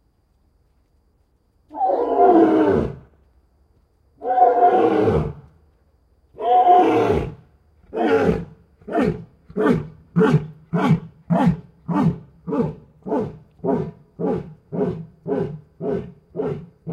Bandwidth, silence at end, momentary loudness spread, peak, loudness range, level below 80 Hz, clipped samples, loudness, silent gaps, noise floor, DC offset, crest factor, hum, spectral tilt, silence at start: 10 kHz; 0 s; 18 LU; -2 dBFS; 8 LU; -46 dBFS; under 0.1%; -20 LUFS; none; -62 dBFS; under 0.1%; 18 dB; none; -9 dB/octave; 1.75 s